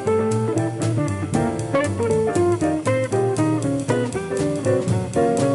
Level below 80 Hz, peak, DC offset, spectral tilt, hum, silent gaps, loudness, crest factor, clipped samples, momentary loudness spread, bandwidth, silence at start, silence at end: -44 dBFS; -8 dBFS; under 0.1%; -6.5 dB/octave; none; none; -21 LUFS; 12 dB; under 0.1%; 3 LU; 11.5 kHz; 0 s; 0 s